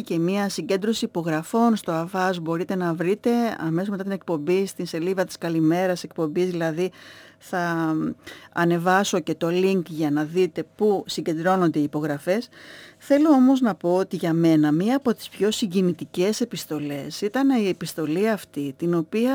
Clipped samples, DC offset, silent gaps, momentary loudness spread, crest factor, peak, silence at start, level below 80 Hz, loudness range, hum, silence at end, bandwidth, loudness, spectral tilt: under 0.1%; under 0.1%; none; 8 LU; 16 dB; -6 dBFS; 0 s; -68 dBFS; 4 LU; none; 0 s; over 20 kHz; -23 LUFS; -6 dB/octave